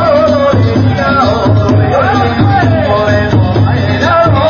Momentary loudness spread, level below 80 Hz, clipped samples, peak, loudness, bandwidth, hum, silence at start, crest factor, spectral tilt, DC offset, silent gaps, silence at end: 2 LU; -24 dBFS; under 0.1%; 0 dBFS; -9 LUFS; 7 kHz; none; 0 s; 8 dB; -7.5 dB/octave; under 0.1%; none; 0 s